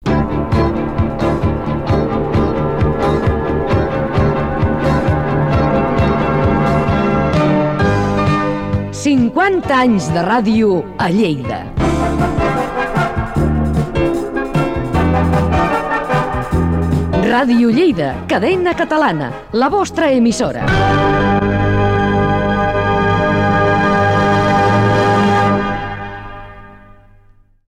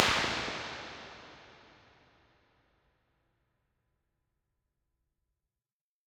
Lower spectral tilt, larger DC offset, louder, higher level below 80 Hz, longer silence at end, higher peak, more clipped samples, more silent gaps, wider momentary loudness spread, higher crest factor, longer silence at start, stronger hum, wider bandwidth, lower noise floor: first, -7 dB/octave vs -2 dB/octave; first, 0.4% vs under 0.1%; first, -15 LUFS vs -34 LUFS; first, -28 dBFS vs -62 dBFS; second, 1.05 s vs 4.5 s; second, -6 dBFS vs -2 dBFS; neither; neither; second, 5 LU vs 25 LU; second, 10 dB vs 38 dB; about the same, 0 s vs 0 s; neither; second, 13 kHz vs 16 kHz; second, -47 dBFS vs under -90 dBFS